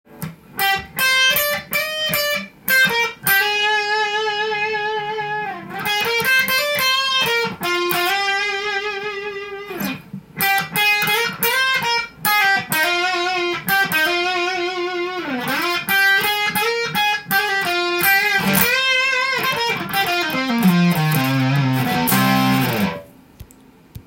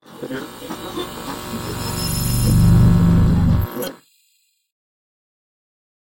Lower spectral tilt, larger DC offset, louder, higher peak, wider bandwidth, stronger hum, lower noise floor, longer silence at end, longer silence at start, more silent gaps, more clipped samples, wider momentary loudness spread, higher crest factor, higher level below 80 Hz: second, -3.5 dB/octave vs -6 dB/octave; neither; about the same, -17 LUFS vs -18 LUFS; first, 0 dBFS vs -4 dBFS; about the same, 17 kHz vs 16.5 kHz; neither; second, -48 dBFS vs -63 dBFS; second, 0.05 s vs 2.2 s; about the same, 0.1 s vs 0.1 s; neither; neither; second, 9 LU vs 17 LU; about the same, 20 dB vs 16 dB; second, -54 dBFS vs -28 dBFS